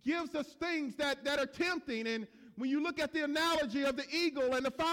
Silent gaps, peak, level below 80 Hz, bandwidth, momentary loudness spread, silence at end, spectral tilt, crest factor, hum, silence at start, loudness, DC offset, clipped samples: none; -22 dBFS; -66 dBFS; 18.5 kHz; 6 LU; 0 s; -3 dB/octave; 12 dB; none; 0.05 s; -34 LUFS; under 0.1%; under 0.1%